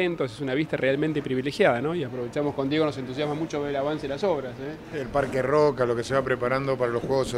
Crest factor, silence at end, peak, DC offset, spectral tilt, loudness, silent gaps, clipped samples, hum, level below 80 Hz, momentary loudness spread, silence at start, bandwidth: 18 dB; 0 s; -8 dBFS; under 0.1%; -6 dB/octave; -26 LUFS; none; under 0.1%; none; -52 dBFS; 8 LU; 0 s; 13.5 kHz